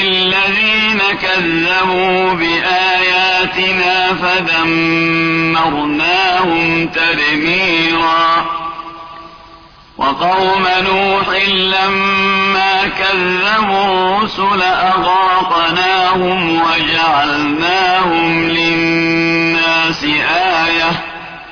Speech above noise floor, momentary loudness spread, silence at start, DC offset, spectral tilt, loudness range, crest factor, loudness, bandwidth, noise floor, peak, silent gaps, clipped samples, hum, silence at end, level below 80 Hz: 27 dB; 3 LU; 0 s; under 0.1%; -4.5 dB/octave; 3 LU; 10 dB; -12 LUFS; 5.4 kHz; -39 dBFS; -2 dBFS; none; under 0.1%; none; 0 s; -44 dBFS